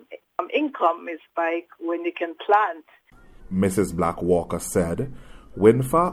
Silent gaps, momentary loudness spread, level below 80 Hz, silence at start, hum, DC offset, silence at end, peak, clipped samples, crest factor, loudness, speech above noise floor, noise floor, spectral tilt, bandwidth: none; 13 LU; -48 dBFS; 0.1 s; none; under 0.1%; 0 s; -2 dBFS; under 0.1%; 20 dB; -23 LUFS; 24 dB; -46 dBFS; -6 dB/octave; 15 kHz